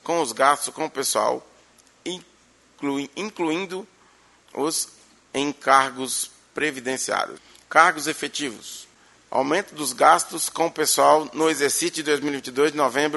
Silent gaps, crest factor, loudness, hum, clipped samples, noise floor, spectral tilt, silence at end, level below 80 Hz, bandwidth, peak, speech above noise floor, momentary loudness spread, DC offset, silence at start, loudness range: none; 24 dB; -22 LUFS; none; under 0.1%; -56 dBFS; -2 dB/octave; 0 s; -70 dBFS; 12 kHz; 0 dBFS; 34 dB; 15 LU; under 0.1%; 0.05 s; 9 LU